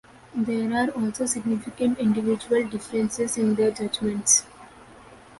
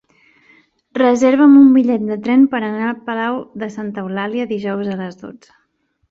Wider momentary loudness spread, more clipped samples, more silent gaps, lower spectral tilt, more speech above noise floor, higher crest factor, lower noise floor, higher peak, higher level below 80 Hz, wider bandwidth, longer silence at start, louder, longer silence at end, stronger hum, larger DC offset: second, 8 LU vs 17 LU; neither; neither; second, -3.5 dB/octave vs -6.5 dB/octave; second, 24 dB vs 50 dB; first, 20 dB vs 14 dB; second, -48 dBFS vs -65 dBFS; second, -6 dBFS vs -2 dBFS; about the same, -58 dBFS vs -60 dBFS; first, 11.5 kHz vs 7.8 kHz; second, 0.35 s vs 0.95 s; second, -24 LUFS vs -15 LUFS; second, 0.05 s vs 0.8 s; neither; neither